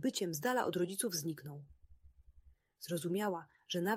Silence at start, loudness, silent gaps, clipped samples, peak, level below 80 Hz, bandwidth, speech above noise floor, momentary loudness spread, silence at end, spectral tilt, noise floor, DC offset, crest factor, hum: 0 s; -38 LUFS; none; under 0.1%; -20 dBFS; -70 dBFS; 16 kHz; 28 dB; 14 LU; 0 s; -4 dB/octave; -66 dBFS; under 0.1%; 18 dB; none